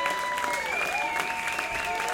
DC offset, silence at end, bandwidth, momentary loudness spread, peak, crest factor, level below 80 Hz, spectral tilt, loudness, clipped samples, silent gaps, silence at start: under 0.1%; 0 s; 17 kHz; 2 LU; -12 dBFS; 16 dB; -56 dBFS; -1 dB/octave; -28 LUFS; under 0.1%; none; 0 s